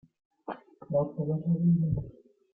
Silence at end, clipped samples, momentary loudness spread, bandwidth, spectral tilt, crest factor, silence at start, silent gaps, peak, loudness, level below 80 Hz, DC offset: 0.45 s; under 0.1%; 19 LU; 3.3 kHz; -13.5 dB/octave; 14 dB; 0.5 s; none; -16 dBFS; -29 LUFS; -54 dBFS; under 0.1%